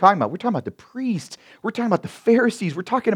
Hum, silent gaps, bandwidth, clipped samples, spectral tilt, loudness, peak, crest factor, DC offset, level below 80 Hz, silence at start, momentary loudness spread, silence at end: none; none; 12.5 kHz; under 0.1%; -6.5 dB/octave; -22 LUFS; 0 dBFS; 20 dB; under 0.1%; -68 dBFS; 0 s; 12 LU; 0 s